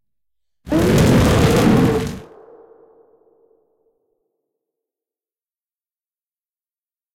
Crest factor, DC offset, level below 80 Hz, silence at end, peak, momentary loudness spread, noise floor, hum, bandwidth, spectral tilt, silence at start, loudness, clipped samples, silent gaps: 16 dB; under 0.1%; -34 dBFS; 4.9 s; -4 dBFS; 11 LU; under -90 dBFS; none; 17 kHz; -6.5 dB/octave; 0.65 s; -15 LUFS; under 0.1%; none